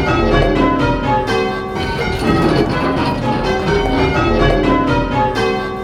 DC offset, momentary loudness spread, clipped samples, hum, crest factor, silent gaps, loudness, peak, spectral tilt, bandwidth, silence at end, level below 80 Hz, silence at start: under 0.1%; 4 LU; under 0.1%; none; 14 dB; none; -15 LUFS; 0 dBFS; -6.5 dB/octave; 14 kHz; 0 s; -24 dBFS; 0 s